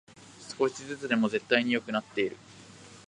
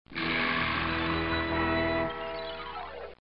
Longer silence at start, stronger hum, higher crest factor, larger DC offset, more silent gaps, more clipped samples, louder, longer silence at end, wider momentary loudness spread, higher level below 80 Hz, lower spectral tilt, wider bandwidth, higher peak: first, 0.2 s vs 0.05 s; neither; first, 26 dB vs 14 dB; second, under 0.1% vs 0.2%; neither; neither; about the same, -29 LUFS vs -30 LUFS; about the same, 0.05 s vs 0 s; first, 23 LU vs 11 LU; second, -72 dBFS vs -46 dBFS; second, -4.5 dB/octave vs -9 dB/octave; first, 10.5 kHz vs 5.6 kHz; first, -6 dBFS vs -16 dBFS